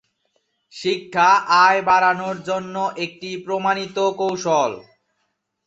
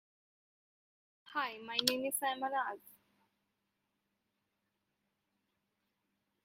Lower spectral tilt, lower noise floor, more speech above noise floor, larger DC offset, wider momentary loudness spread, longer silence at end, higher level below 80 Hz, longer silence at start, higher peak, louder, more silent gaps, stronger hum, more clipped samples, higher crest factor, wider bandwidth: first, -3.5 dB/octave vs -1 dB/octave; second, -73 dBFS vs -85 dBFS; first, 54 dB vs 48 dB; neither; first, 13 LU vs 9 LU; second, 0.85 s vs 3.55 s; first, -66 dBFS vs -88 dBFS; second, 0.75 s vs 1.25 s; first, -2 dBFS vs -10 dBFS; first, -19 LUFS vs -36 LUFS; neither; neither; neither; second, 18 dB vs 34 dB; second, 8 kHz vs 16 kHz